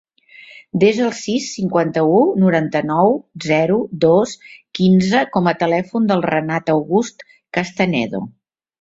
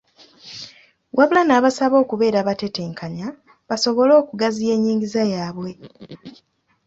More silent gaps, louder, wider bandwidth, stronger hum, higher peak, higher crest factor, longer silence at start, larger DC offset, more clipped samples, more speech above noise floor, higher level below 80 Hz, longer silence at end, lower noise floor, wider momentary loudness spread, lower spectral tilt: neither; about the same, -17 LUFS vs -19 LUFS; about the same, 7.8 kHz vs 8 kHz; neither; about the same, 0 dBFS vs -2 dBFS; about the same, 16 dB vs 18 dB; about the same, 0.5 s vs 0.45 s; neither; neither; about the same, 28 dB vs 26 dB; first, -56 dBFS vs -62 dBFS; about the same, 0.5 s vs 0.55 s; about the same, -44 dBFS vs -45 dBFS; second, 10 LU vs 20 LU; about the same, -6 dB/octave vs -5 dB/octave